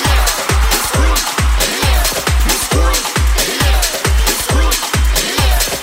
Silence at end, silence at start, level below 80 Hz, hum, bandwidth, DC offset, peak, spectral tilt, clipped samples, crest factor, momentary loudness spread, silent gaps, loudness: 0 s; 0 s; -16 dBFS; none; 16.5 kHz; under 0.1%; 0 dBFS; -3 dB/octave; under 0.1%; 12 dB; 1 LU; none; -13 LUFS